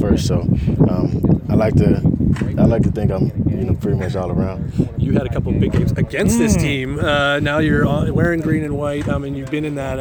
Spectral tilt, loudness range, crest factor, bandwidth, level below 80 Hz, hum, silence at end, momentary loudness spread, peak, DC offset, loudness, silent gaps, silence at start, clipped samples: -7 dB/octave; 2 LU; 16 dB; 20 kHz; -30 dBFS; none; 0 s; 6 LU; 0 dBFS; under 0.1%; -17 LUFS; none; 0 s; under 0.1%